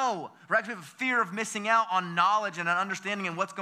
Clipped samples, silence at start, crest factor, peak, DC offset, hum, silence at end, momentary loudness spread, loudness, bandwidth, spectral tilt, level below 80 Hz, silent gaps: under 0.1%; 0 s; 18 dB; -10 dBFS; under 0.1%; none; 0 s; 7 LU; -28 LUFS; 15.5 kHz; -3.5 dB/octave; under -90 dBFS; none